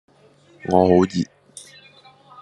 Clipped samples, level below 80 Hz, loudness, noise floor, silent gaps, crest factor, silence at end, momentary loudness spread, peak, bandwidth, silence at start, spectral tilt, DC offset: under 0.1%; -62 dBFS; -19 LUFS; -53 dBFS; none; 20 dB; 1.15 s; 25 LU; -2 dBFS; 11.5 kHz; 0.65 s; -7 dB/octave; under 0.1%